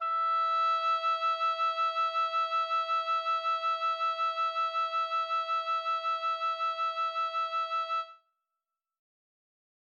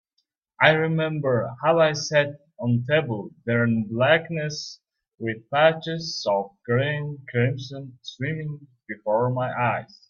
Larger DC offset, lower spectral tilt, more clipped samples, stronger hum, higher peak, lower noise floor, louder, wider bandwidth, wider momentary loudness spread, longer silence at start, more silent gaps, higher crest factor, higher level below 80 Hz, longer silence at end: neither; second, 3 dB/octave vs -5.5 dB/octave; neither; neither; second, -22 dBFS vs 0 dBFS; first, -89 dBFS vs -75 dBFS; second, -30 LUFS vs -24 LUFS; about the same, 7 kHz vs 7.2 kHz; second, 4 LU vs 13 LU; second, 0 s vs 0.6 s; neither; second, 10 dB vs 24 dB; second, under -90 dBFS vs -64 dBFS; first, 1.85 s vs 0.25 s